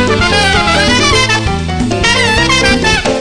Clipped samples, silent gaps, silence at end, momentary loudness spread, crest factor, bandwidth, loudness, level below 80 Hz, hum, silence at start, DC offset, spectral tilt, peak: under 0.1%; none; 0 s; 5 LU; 10 dB; 10.5 kHz; -9 LUFS; -24 dBFS; none; 0 s; 3%; -3.5 dB/octave; 0 dBFS